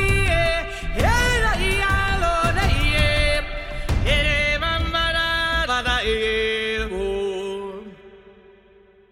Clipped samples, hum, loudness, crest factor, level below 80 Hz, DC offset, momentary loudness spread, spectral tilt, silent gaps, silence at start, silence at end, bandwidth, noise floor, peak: under 0.1%; none; -21 LUFS; 16 dB; -26 dBFS; under 0.1%; 9 LU; -4 dB/octave; none; 0 s; 0.8 s; 16 kHz; -52 dBFS; -4 dBFS